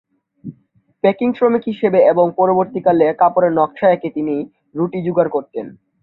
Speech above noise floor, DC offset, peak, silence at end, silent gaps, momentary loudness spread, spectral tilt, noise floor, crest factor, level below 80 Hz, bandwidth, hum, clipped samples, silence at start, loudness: 42 dB; under 0.1%; -2 dBFS; 0.3 s; none; 16 LU; -10.5 dB/octave; -58 dBFS; 16 dB; -60 dBFS; 4.2 kHz; none; under 0.1%; 0.45 s; -16 LUFS